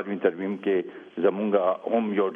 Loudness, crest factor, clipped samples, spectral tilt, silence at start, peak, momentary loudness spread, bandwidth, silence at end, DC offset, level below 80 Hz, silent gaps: -26 LUFS; 18 dB; under 0.1%; -9 dB/octave; 0 s; -8 dBFS; 5 LU; 3.7 kHz; 0 s; under 0.1%; -74 dBFS; none